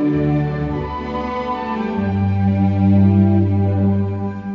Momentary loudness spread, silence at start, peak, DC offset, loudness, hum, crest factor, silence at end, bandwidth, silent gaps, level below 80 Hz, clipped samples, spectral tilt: 10 LU; 0 s; -2 dBFS; under 0.1%; -18 LUFS; none; 14 dB; 0 s; 5.2 kHz; none; -38 dBFS; under 0.1%; -10.5 dB/octave